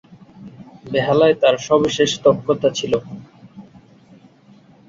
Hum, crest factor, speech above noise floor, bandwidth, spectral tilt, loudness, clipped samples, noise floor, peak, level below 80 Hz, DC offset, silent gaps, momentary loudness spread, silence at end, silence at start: none; 18 dB; 32 dB; 7.8 kHz; -4.5 dB/octave; -17 LUFS; under 0.1%; -49 dBFS; -2 dBFS; -56 dBFS; under 0.1%; none; 9 LU; 1.25 s; 0.4 s